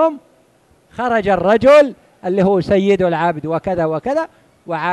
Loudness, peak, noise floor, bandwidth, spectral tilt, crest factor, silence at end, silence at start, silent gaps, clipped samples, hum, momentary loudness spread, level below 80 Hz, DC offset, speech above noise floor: -15 LUFS; -2 dBFS; -54 dBFS; 11.5 kHz; -7 dB/octave; 14 dB; 0 s; 0 s; none; under 0.1%; none; 16 LU; -46 dBFS; under 0.1%; 39 dB